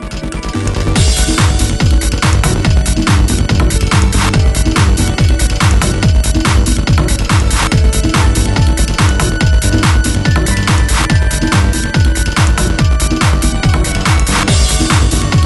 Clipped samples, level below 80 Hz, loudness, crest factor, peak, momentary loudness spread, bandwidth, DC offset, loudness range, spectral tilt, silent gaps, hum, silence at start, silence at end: under 0.1%; -14 dBFS; -12 LUFS; 10 dB; 0 dBFS; 2 LU; 12 kHz; under 0.1%; 1 LU; -4.5 dB/octave; none; none; 0 s; 0 s